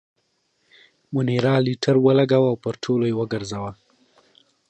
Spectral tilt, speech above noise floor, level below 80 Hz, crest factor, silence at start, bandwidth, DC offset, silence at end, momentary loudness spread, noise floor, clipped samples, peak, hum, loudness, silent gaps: -7 dB/octave; 49 dB; -60 dBFS; 18 dB; 1.1 s; 9 kHz; under 0.1%; 0.95 s; 12 LU; -69 dBFS; under 0.1%; -4 dBFS; none; -21 LUFS; none